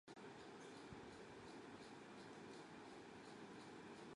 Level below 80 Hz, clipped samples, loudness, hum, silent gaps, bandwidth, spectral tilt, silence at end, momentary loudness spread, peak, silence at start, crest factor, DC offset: -80 dBFS; under 0.1%; -58 LUFS; none; none; 11 kHz; -4.5 dB/octave; 0 s; 1 LU; -44 dBFS; 0.05 s; 14 dB; under 0.1%